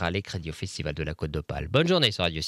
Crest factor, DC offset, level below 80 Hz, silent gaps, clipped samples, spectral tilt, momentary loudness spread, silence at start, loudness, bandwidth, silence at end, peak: 18 dB; under 0.1%; -44 dBFS; none; under 0.1%; -5 dB/octave; 12 LU; 0 s; -27 LUFS; 15.5 kHz; 0 s; -8 dBFS